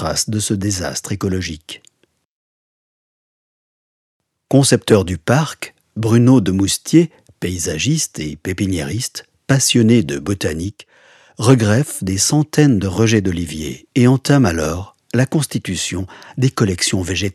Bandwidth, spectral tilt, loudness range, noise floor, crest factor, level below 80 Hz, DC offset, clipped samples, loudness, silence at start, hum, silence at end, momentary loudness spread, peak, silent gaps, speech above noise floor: 14 kHz; -5 dB/octave; 8 LU; -57 dBFS; 18 dB; -44 dBFS; under 0.1%; under 0.1%; -16 LUFS; 0 s; none; 0.05 s; 13 LU; 0 dBFS; 2.25-4.20 s; 41 dB